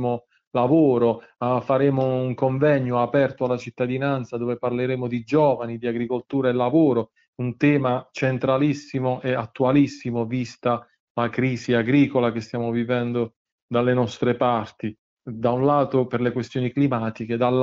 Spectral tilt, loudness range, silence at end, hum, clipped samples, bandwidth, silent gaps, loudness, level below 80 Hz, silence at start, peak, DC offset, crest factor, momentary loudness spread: -8 dB/octave; 2 LU; 0 s; none; under 0.1%; 7.6 kHz; 0.47-0.51 s, 7.28-7.33 s, 11.00-11.15 s, 13.36-13.45 s, 13.52-13.69 s, 14.99-15.17 s; -23 LUFS; -60 dBFS; 0 s; -6 dBFS; under 0.1%; 16 dB; 8 LU